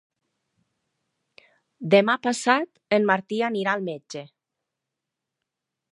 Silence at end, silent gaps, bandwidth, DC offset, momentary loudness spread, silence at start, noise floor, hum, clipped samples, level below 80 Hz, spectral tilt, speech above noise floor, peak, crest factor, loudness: 1.65 s; none; 11.5 kHz; under 0.1%; 17 LU; 1.8 s; -85 dBFS; none; under 0.1%; -78 dBFS; -4.5 dB/octave; 62 dB; -4 dBFS; 24 dB; -23 LUFS